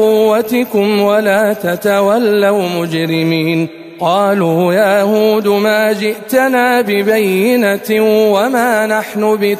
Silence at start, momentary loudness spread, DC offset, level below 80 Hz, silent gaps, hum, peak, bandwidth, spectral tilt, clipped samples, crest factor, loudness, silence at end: 0 s; 4 LU; under 0.1%; -58 dBFS; none; none; 0 dBFS; 15 kHz; -5.5 dB/octave; under 0.1%; 12 dB; -12 LUFS; 0 s